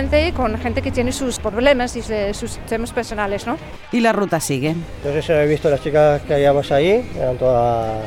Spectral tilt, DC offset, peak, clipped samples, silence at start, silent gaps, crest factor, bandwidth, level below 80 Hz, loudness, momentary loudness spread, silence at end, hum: -5.5 dB/octave; under 0.1%; 0 dBFS; under 0.1%; 0 s; none; 18 dB; 16.5 kHz; -34 dBFS; -19 LUFS; 8 LU; 0 s; none